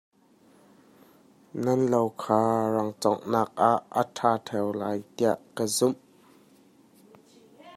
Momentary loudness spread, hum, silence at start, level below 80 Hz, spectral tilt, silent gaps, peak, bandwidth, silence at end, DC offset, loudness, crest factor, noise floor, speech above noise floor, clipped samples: 7 LU; none; 1.55 s; -72 dBFS; -5 dB/octave; none; -6 dBFS; 16 kHz; 0 s; under 0.1%; -26 LUFS; 22 dB; -59 dBFS; 34 dB; under 0.1%